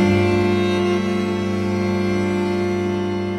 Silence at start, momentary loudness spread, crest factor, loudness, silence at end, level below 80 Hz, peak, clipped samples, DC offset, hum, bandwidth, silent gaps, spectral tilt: 0 s; 4 LU; 14 dB; -20 LUFS; 0 s; -48 dBFS; -6 dBFS; under 0.1%; under 0.1%; none; 12 kHz; none; -7 dB/octave